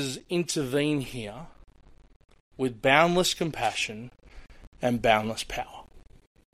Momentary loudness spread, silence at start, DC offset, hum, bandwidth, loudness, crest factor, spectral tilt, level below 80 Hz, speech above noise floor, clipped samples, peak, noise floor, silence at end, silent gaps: 18 LU; 0 s; under 0.1%; none; 15.5 kHz; -26 LUFS; 24 dB; -4 dB/octave; -52 dBFS; 23 dB; under 0.1%; -4 dBFS; -50 dBFS; 0.55 s; 2.16-2.20 s, 2.40-2.51 s, 4.67-4.72 s